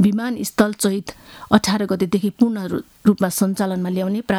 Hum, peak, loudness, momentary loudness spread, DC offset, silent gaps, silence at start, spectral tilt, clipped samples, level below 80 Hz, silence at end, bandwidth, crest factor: none; 0 dBFS; -20 LUFS; 8 LU; under 0.1%; none; 0 s; -5.5 dB/octave; under 0.1%; -50 dBFS; 0 s; 18 kHz; 18 dB